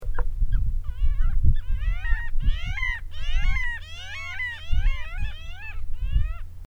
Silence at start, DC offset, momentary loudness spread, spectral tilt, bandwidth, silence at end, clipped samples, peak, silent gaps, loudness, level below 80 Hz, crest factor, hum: 0 s; under 0.1%; 9 LU; -5 dB/octave; 6.6 kHz; 0 s; under 0.1%; -4 dBFS; none; -30 LUFS; -24 dBFS; 16 dB; none